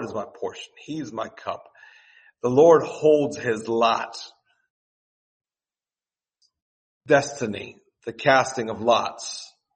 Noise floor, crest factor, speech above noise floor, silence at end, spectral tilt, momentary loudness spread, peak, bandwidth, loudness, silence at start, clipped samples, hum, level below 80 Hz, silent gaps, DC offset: under -90 dBFS; 22 dB; over 68 dB; 0.3 s; -4.5 dB/octave; 20 LU; -2 dBFS; 8.8 kHz; -22 LUFS; 0 s; under 0.1%; none; -68 dBFS; 4.70-5.40 s, 6.62-7.01 s; under 0.1%